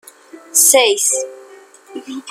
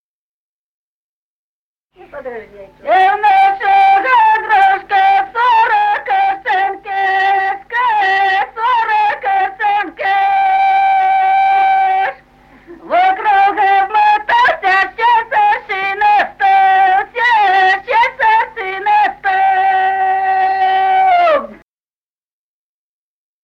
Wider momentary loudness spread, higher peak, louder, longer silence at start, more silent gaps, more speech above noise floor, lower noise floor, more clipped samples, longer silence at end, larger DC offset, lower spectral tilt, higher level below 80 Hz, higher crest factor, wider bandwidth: first, 23 LU vs 6 LU; about the same, 0 dBFS vs -2 dBFS; about the same, -12 LUFS vs -12 LUFS; second, 0.35 s vs 2.15 s; neither; second, 27 dB vs over 75 dB; second, -42 dBFS vs under -90 dBFS; neither; second, 0 s vs 1.9 s; neither; second, 2 dB/octave vs -3 dB/octave; second, -72 dBFS vs -54 dBFS; first, 18 dB vs 12 dB; first, over 20 kHz vs 6.6 kHz